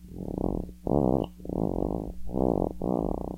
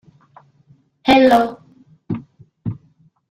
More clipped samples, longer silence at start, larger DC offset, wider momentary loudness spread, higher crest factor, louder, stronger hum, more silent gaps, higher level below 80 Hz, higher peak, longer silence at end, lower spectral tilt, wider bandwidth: neither; second, 0 s vs 1.05 s; neither; second, 8 LU vs 19 LU; about the same, 20 dB vs 20 dB; second, -30 LUFS vs -16 LUFS; neither; neither; first, -40 dBFS vs -52 dBFS; second, -8 dBFS vs 0 dBFS; second, 0 s vs 0.55 s; first, -10.5 dB/octave vs -6 dB/octave; about the same, 16 kHz vs 15.5 kHz